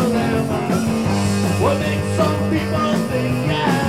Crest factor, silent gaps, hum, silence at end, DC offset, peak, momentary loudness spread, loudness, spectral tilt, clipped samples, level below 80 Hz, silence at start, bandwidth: 12 dB; none; none; 0 s; 0.4%; -6 dBFS; 2 LU; -19 LUFS; -6 dB/octave; under 0.1%; -40 dBFS; 0 s; 16 kHz